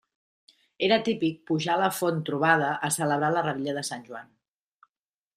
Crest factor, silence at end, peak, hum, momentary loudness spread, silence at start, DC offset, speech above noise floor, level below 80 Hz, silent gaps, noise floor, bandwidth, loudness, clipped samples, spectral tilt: 22 dB; 1.15 s; -6 dBFS; none; 10 LU; 0.8 s; under 0.1%; over 64 dB; -72 dBFS; none; under -90 dBFS; 15 kHz; -26 LUFS; under 0.1%; -4 dB/octave